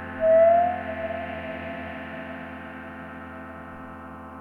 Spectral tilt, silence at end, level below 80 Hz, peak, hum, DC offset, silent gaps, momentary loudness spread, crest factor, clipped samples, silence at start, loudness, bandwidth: -8 dB/octave; 0 s; -60 dBFS; -10 dBFS; none; under 0.1%; none; 22 LU; 16 dB; under 0.1%; 0 s; -24 LUFS; 4.1 kHz